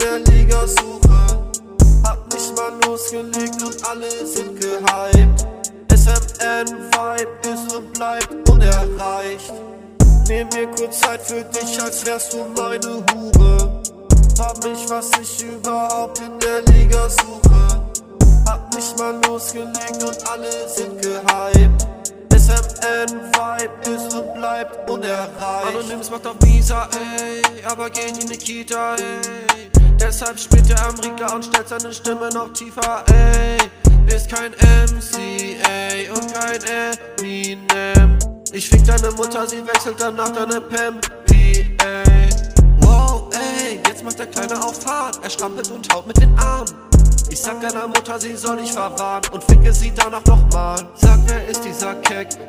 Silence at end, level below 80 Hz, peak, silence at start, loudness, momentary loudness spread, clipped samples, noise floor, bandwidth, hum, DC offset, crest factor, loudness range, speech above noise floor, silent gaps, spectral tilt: 0 s; -16 dBFS; 0 dBFS; 0 s; -17 LUFS; 11 LU; under 0.1%; -34 dBFS; 15.5 kHz; none; under 0.1%; 14 dB; 4 LU; 18 dB; none; -4.5 dB/octave